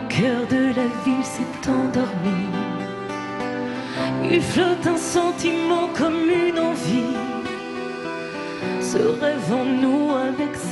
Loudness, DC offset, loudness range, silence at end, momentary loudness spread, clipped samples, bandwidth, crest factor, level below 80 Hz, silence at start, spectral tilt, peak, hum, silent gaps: -22 LUFS; under 0.1%; 3 LU; 0 s; 9 LU; under 0.1%; 12 kHz; 16 dB; -54 dBFS; 0 s; -5 dB/octave; -6 dBFS; none; none